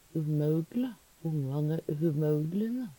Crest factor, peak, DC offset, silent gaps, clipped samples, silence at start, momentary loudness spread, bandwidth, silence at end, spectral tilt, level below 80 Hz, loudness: 12 dB; -18 dBFS; under 0.1%; none; under 0.1%; 0.15 s; 6 LU; 17.5 kHz; 0.05 s; -9.5 dB/octave; -68 dBFS; -32 LUFS